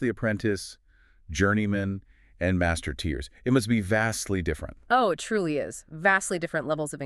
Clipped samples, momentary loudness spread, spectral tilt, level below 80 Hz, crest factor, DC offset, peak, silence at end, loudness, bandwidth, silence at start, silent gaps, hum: under 0.1%; 10 LU; -5 dB/octave; -44 dBFS; 20 dB; under 0.1%; -8 dBFS; 0 s; -27 LUFS; 13.5 kHz; 0 s; none; none